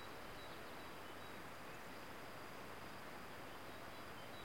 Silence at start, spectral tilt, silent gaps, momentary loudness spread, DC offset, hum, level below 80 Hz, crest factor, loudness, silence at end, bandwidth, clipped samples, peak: 0 s; -4 dB/octave; none; 0 LU; 0.1%; none; -72 dBFS; 14 dB; -53 LUFS; 0 s; 16.5 kHz; under 0.1%; -38 dBFS